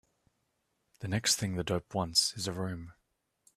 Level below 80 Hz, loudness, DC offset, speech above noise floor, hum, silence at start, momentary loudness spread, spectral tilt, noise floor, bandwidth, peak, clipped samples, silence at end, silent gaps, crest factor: -62 dBFS; -31 LUFS; under 0.1%; 47 dB; none; 1 s; 11 LU; -3 dB/octave; -79 dBFS; 15.5 kHz; -12 dBFS; under 0.1%; 0.65 s; none; 22 dB